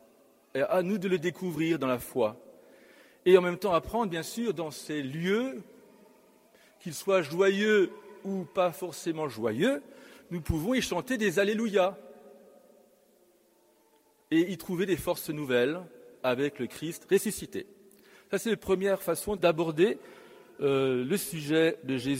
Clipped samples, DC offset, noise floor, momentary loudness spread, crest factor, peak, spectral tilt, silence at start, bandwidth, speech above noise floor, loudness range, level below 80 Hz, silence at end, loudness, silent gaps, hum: under 0.1%; under 0.1%; -65 dBFS; 11 LU; 22 dB; -8 dBFS; -5 dB/octave; 0.55 s; 16 kHz; 37 dB; 4 LU; -56 dBFS; 0 s; -29 LUFS; none; none